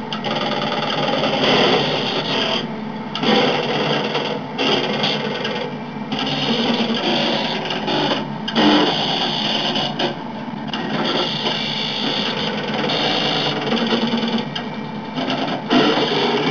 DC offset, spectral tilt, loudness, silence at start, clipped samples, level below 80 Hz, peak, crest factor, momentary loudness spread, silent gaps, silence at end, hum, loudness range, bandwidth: 0.4%; -4.5 dB/octave; -19 LUFS; 0 s; under 0.1%; -56 dBFS; -6 dBFS; 14 dB; 9 LU; none; 0 s; none; 2 LU; 5.4 kHz